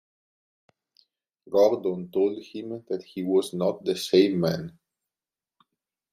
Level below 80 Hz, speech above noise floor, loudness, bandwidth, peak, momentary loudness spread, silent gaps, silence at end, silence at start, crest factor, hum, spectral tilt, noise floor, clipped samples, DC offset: -70 dBFS; over 65 dB; -25 LUFS; 14.5 kHz; -8 dBFS; 14 LU; none; 1.45 s; 1.5 s; 20 dB; none; -6 dB/octave; under -90 dBFS; under 0.1%; under 0.1%